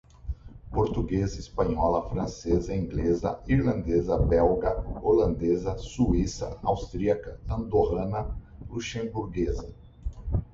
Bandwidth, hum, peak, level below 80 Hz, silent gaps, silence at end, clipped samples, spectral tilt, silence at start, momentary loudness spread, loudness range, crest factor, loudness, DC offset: 7.8 kHz; none; -10 dBFS; -36 dBFS; none; 0.1 s; under 0.1%; -7.5 dB/octave; 0.25 s; 14 LU; 5 LU; 16 dB; -28 LUFS; under 0.1%